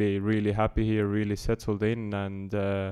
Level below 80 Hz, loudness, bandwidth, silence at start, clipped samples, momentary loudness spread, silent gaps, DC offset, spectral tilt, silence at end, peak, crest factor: -42 dBFS; -28 LUFS; 12.5 kHz; 0 s; under 0.1%; 6 LU; none; under 0.1%; -7.5 dB/octave; 0 s; -14 dBFS; 14 dB